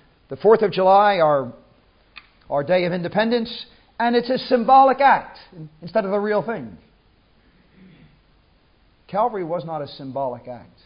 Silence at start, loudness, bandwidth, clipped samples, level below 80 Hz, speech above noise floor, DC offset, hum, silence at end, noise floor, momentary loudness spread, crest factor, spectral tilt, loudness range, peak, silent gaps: 0.3 s; -19 LUFS; 5.4 kHz; under 0.1%; -60 dBFS; 38 dB; under 0.1%; none; 0.25 s; -58 dBFS; 22 LU; 18 dB; -10.5 dB/octave; 11 LU; -2 dBFS; none